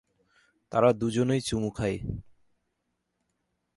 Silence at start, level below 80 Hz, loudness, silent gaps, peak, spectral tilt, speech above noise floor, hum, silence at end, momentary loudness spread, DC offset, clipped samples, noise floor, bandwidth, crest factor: 0.7 s; -52 dBFS; -28 LUFS; none; -8 dBFS; -6 dB/octave; 53 dB; none; 1.55 s; 12 LU; under 0.1%; under 0.1%; -80 dBFS; 11.5 kHz; 22 dB